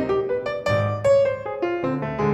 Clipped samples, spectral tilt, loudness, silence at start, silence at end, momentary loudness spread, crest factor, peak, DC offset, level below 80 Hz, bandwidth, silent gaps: under 0.1%; -7 dB/octave; -22 LUFS; 0 s; 0 s; 7 LU; 12 dB; -8 dBFS; under 0.1%; -50 dBFS; 10.5 kHz; none